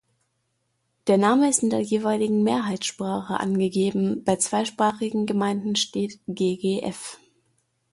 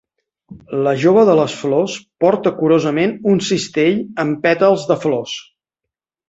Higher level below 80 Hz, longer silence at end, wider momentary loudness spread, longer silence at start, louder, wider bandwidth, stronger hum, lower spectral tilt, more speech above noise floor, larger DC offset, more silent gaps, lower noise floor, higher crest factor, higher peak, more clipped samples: second, -64 dBFS vs -58 dBFS; about the same, 0.75 s vs 0.85 s; about the same, 9 LU vs 9 LU; first, 1.05 s vs 0.5 s; second, -24 LUFS vs -16 LUFS; first, 11.5 kHz vs 8 kHz; neither; about the same, -4.5 dB/octave vs -5.5 dB/octave; second, 50 dB vs 68 dB; neither; neither; second, -73 dBFS vs -83 dBFS; about the same, 18 dB vs 14 dB; second, -8 dBFS vs -2 dBFS; neither